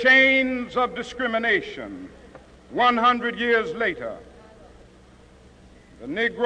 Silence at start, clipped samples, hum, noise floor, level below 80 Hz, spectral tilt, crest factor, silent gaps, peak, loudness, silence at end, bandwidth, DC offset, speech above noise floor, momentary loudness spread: 0 s; under 0.1%; none; -50 dBFS; -54 dBFS; -4 dB/octave; 18 dB; none; -6 dBFS; -21 LUFS; 0 s; 9.8 kHz; under 0.1%; 28 dB; 19 LU